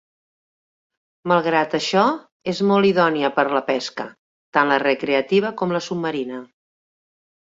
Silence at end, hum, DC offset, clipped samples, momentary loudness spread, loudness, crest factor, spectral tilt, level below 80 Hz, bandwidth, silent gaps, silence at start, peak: 0.95 s; none; under 0.1%; under 0.1%; 12 LU; -20 LUFS; 20 dB; -5.5 dB/octave; -66 dBFS; 7.8 kHz; 2.32-2.40 s, 4.18-4.53 s; 1.25 s; -2 dBFS